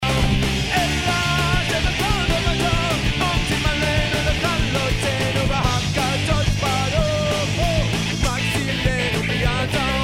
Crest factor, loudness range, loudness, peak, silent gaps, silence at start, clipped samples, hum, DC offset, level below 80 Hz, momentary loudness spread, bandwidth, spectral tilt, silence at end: 16 dB; 1 LU; -20 LUFS; -4 dBFS; none; 0 s; under 0.1%; none; under 0.1%; -28 dBFS; 2 LU; 16 kHz; -4.5 dB/octave; 0 s